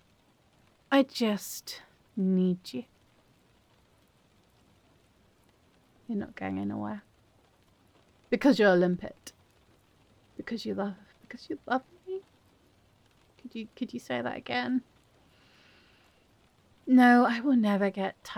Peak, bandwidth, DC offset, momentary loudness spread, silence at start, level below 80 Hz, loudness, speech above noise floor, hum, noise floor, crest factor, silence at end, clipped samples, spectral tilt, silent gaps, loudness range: -12 dBFS; 17.5 kHz; under 0.1%; 21 LU; 0.9 s; -72 dBFS; -28 LUFS; 38 dB; none; -65 dBFS; 20 dB; 0 s; under 0.1%; -6 dB/octave; none; 12 LU